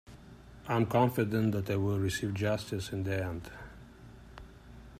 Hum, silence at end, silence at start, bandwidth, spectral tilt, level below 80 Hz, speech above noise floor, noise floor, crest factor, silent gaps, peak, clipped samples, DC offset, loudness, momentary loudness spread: none; 0 s; 0.1 s; 15.5 kHz; -6.5 dB/octave; -56 dBFS; 21 dB; -52 dBFS; 18 dB; none; -16 dBFS; under 0.1%; under 0.1%; -32 LUFS; 25 LU